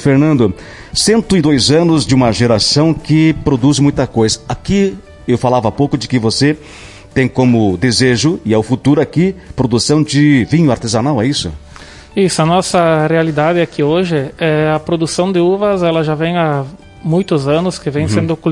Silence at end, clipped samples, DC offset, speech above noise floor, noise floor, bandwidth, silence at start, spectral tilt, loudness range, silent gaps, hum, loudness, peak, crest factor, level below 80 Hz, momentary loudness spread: 0 s; under 0.1%; under 0.1%; 23 dB; -35 dBFS; 11.5 kHz; 0 s; -5.5 dB/octave; 3 LU; none; none; -13 LUFS; 0 dBFS; 12 dB; -38 dBFS; 7 LU